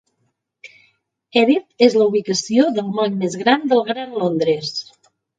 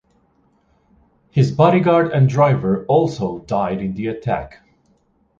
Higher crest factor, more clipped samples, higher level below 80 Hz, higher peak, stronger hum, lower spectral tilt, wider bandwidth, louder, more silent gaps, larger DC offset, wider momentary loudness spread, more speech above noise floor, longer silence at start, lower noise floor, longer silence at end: about the same, 18 dB vs 18 dB; neither; second, -68 dBFS vs -48 dBFS; about the same, 0 dBFS vs -2 dBFS; neither; second, -4.5 dB/octave vs -8.5 dB/octave; first, 9.2 kHz vs 7.6 kHz; about the same, -18 LUFS vs -17 LUFS; neither; neither; second, 7 LU vs 10 LU; first, 53 dB vs 44 dB; second, 0.65 s vs 1.35 s; first, -70 dBFS vs -60 dBFS; second, 0.55 s vs 0.9 s